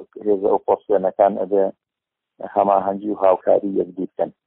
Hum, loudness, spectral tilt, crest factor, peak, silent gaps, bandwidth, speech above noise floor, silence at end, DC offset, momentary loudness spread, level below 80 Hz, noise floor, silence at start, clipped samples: none; -20 LUFS; -7 dB/octave; 18 dB; -2 dBFS; none; 3.9 kHz; 65 dB; 0.15 s; under 0.1%; 8 LU; -64 dBFS; -84 dBFS; 0 s; under 0.1%